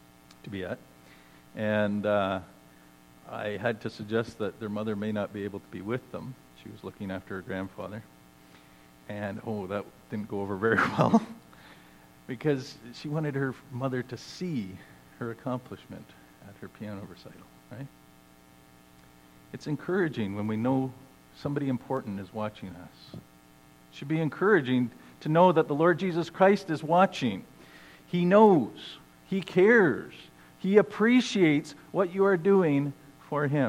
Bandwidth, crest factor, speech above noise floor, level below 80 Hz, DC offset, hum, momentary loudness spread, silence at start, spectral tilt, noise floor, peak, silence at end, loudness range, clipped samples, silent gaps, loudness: 16.5 kHz; 22 dB; 28 dB; -68 dBFS; under 0.1%; none; 22 LU; 0.45 s; -7 dB/octave; -56 dBFS; -6 dBFS; 0 s; 15 LU; under 0.1%; none; -28 LUFS